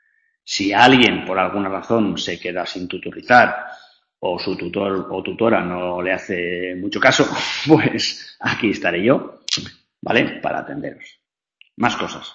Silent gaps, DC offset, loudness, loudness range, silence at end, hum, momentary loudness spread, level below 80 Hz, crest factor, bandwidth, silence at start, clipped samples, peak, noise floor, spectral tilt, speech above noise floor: none; under 0.1%; -18 LUFS; 5 LU; 0 s; none; 14 LU; -56 dBFS; 20 dB; 8.6 kHz; 0.45 s; under 0.1%; 0 dBFS; -56 dBFS; -4.5 dB/octave; 37 dB